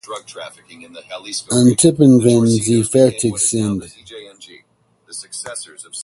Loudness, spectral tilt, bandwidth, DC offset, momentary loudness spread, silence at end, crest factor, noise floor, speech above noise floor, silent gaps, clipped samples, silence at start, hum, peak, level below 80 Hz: -14 LUFS; -5.5 dB/octave; 11.5 kHz; under 0.1%; 23 LU; 0 s; 16 dB; -58 dBFS; 42 dB; none; under 0.1%; 0.1 s; none; 0 dBFS; -52 dBFS